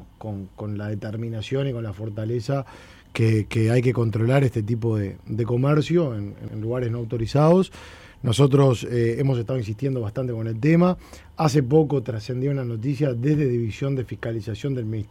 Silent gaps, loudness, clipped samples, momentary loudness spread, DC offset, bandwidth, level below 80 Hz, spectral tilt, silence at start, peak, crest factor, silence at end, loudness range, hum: none; -23 LUFS; under 0.1%; 13 LU; under 0.1%; 12.5 kHz; -50 dBFS; -7.5 dB/octave; 0 s; -6 dBFS; 16 dB; 0.05 s; 3 LU; none